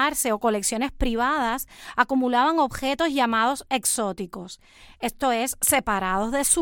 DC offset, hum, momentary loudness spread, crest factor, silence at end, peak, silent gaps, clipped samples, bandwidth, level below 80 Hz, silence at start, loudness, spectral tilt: under 0.1%; none; 11 LU; 20 dB; 0 s; -4 dBFS; none; under 0.1%; 17.5 kHz; -42 dBFS; 0 s; -23 LUFS; -2.5 dB/octave